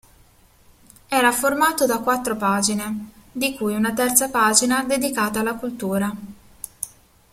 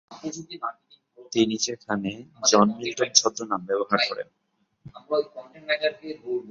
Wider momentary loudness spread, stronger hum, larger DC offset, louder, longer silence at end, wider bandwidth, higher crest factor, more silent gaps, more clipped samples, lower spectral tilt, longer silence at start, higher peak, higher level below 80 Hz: about the same, 16 LU vs 16 LU; neither; neither; first, -20 LUFS vs -24 LUFS; first, 0.45 s vs 0 s; first, 16.5 kHz vs 7.8 kHz; about the same, 22 dB vs 26 dB; neither; neither; about the same, -2.5 dB/octave vs -2.5 dB/octave; first, 1.1 s vs 0.1 s; about the same, 0 dBFS vs 0 dBFS; first, -54 dBFS vs -66 dBFS